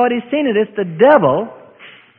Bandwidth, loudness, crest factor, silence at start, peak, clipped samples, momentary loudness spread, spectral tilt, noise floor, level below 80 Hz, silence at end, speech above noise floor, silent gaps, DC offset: 4.1 kHz; -14 LUFS; 16 dB; 0 s; 0 dBFS; under 0.1%; 10 LU; -9.5 dB/octave; -42 dBFS; -60 dBFS; 0.3 s; 28 dB; none; under 0.1%